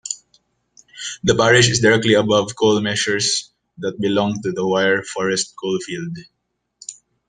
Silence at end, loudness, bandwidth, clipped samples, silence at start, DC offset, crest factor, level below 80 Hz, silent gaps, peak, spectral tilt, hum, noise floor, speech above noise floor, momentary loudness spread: 0.35 s; -18 LUFS; 10.5 kHz; under 0.1%; 0.05 s; under 0.1%; 18 dB; -54 dBFS; none; -2 dBFS; -3.5 dB/octave; none; -61 dBFS; 44 dB; 17 LU